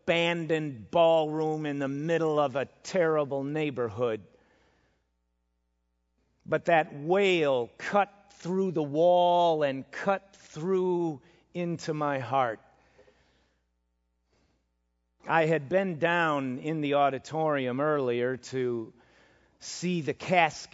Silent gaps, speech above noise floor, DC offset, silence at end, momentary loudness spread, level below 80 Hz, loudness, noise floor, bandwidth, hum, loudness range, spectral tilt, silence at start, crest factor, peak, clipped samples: none; 49 dB; under 0.1%; 0.1 s; 11 LU; -72 dBFS; -28 LUFS; -77 dBFS; 8 kHz; none; 8 LU; -5.5 dB/octave; 0.05 s; 20 dB; -8 dBFS; under 0.1%